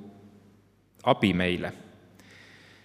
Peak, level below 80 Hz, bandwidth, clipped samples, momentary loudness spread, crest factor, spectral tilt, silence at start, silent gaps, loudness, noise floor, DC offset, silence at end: -6 dBFS; -66 dBFS; 13.5 kHz; under 0.1%; 24 LU; 24 dB; -6.5 dB/octave; 0 s; none; -27 LUFS; -61 dBFS; under 0.1%; 1.05 s